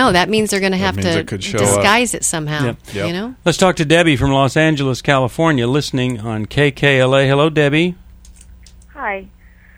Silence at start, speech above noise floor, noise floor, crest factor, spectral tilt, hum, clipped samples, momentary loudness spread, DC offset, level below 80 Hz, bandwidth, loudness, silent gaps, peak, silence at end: 0 s; 26 dB; -41 dBFS; 16 dB; -4.5 dB/octave; none; under 0.1%; 9 LU; under 0.1%; -40 dBFS; 16 kHz; -15 LUFS; none; 0 dBFS; 0.5 s